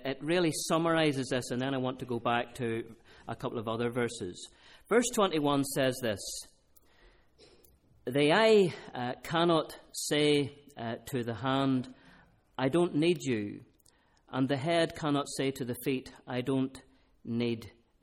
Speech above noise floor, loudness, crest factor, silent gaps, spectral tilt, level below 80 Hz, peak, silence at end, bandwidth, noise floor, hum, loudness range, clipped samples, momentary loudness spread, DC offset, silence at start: 36 dB; -31 LUFS; 18 dB; none; -5 dB/octave; -64 dBFS; -12 dBFS; 0.35 s; 16 kHz; -66 dBFS; none; 5 LU; under 0.1%; 13 LU; under 0.1%; 0 s